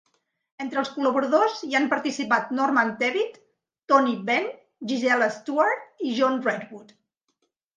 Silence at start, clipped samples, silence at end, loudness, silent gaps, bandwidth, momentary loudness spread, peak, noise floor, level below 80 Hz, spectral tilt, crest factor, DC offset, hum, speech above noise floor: 0.6 s; under 0.1%; 0.95 s; -24 LUFS; none; 9.6 kHz; 9 LU; -6 dBFS; -75 dBFS; -78 dBFS; -4 dB/octave; 20 dB; under 0.1%; none; 51 dB